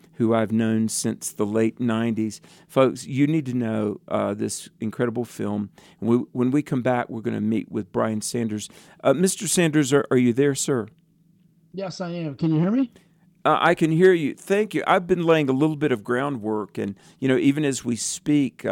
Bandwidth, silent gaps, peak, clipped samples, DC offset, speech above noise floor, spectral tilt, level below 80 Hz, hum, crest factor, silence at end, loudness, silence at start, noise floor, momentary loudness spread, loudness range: 17 kHz; none; -6 dBFS; under 0.1%; under 0.1%; 37 dB; -5.5 dB/octave; -64 dBFS; none; 16 dB; 0 s; -23 LUFS; 0.2 s; -59 dBFS; 11 LU; 5 LU